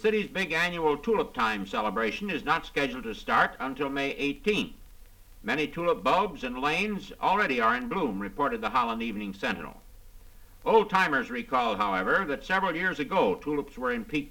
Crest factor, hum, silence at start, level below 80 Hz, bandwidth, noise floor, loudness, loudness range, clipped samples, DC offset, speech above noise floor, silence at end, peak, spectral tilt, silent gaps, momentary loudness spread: 20 dB; none; 0 s; -52 dBFS; 19 kHz; -50 dBFS; -28 LUFS; 3 LU; under 0.1%; under 0.1%; 22 dB; 0 s; -8 dBFS; -5 dB/octave; none; 7 LU